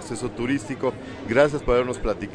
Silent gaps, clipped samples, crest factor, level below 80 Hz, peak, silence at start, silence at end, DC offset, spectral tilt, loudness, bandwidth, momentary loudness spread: none; under 0.1%; 18 dB; -38 dBFS; -6 dBFS; 0 s; 0 s; under 0.1%; -5.5 dB/octave; -24 LUFS; 10.5 kHz; 9 LU